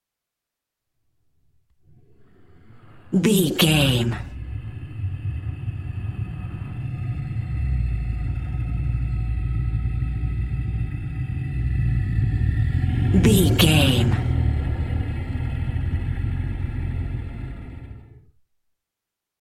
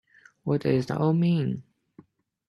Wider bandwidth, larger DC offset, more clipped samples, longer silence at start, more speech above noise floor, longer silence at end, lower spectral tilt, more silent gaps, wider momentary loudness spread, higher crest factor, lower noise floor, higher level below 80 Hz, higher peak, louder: first, 16.5 kHz vs 7 kHz; neither; neither; first, 2.4 s vs 0.45 s; first, 67 dB vs 32 dB; first, 1.25 s vs 0.9 s; second, -5.5 dB/octave vs -9 dB/octave; neither; first, 15 LU vs 12 LU; about the same, 20 dB vs 16 dB; first, -85 dBFS vs -56 dBFS; first, -30 dBFS vs -64 dBFS; first, -4 dBFS vs -10 dBFS; first, -23 LUFS vs -26 LUFS